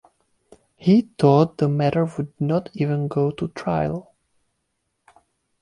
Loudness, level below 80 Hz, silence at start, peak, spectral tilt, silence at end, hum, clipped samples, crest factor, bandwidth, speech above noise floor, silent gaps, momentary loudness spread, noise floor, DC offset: -21 LUFS; -54 dBFS; 0.8 s; -4 dBFS; -9 dB/octave; 1.6 s; none; under 0.1%; 18 dB; 10.5 kHz; 54 dB; none; 10 LU; -74 dBFS; under 0.1%